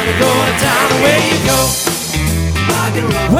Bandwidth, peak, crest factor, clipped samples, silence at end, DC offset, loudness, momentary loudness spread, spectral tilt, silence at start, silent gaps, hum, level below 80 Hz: 17.5 kHz; 0 dBFS; 12 dB; under 0.1%; 0 s; under 0.1%; -12 LUFS; 5 LU; -4 dB/octave; 0 s; none; none; -26 dBFS